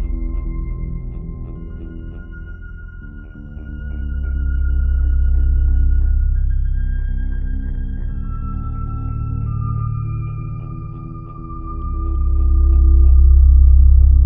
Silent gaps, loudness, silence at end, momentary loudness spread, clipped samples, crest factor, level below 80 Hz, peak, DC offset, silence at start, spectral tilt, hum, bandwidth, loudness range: none; -19 LUFS; 0 s; 21 LU; under 0.1%; 14 dB; -16 dBFS; -2 dBFS; under 0.1%; 0 s; -12.5 dB/octave; none; 1.7 kHz; 14 LU